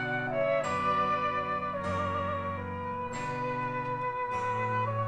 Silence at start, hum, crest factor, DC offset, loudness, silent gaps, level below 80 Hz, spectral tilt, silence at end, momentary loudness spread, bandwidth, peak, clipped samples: 0 s; none; 12 dB; under 0.1%; -31 LUFS; none; -60 dBFS; -6 dB/octave; 0 s; 7 LU; 10.5 kHz; -18 dBFS; under 0.1%